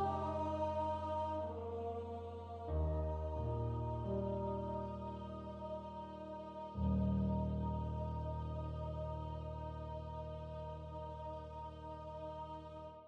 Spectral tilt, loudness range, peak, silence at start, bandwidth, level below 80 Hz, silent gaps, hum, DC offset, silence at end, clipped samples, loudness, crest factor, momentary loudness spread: -9.5 dB/octave; 6 LU; -26 dBFS; 0 s; 6.6 kHz; -48 dBFS; none; none; under 0.1%; 0 s; under 0.1%; -43 LUFS; 14 dB; 10 LU